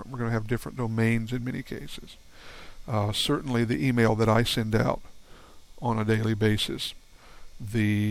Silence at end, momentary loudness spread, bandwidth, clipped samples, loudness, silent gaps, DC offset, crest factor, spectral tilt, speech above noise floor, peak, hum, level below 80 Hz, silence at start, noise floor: 0 s; 17 LU; 16 kHz; under 0.1%; -27 LUFS; none; under 0.1%; 18 dB; -6 dB/octave; 21 dB; -10 dBFS; none; -48 dBFS; 0 s; -48 dBFS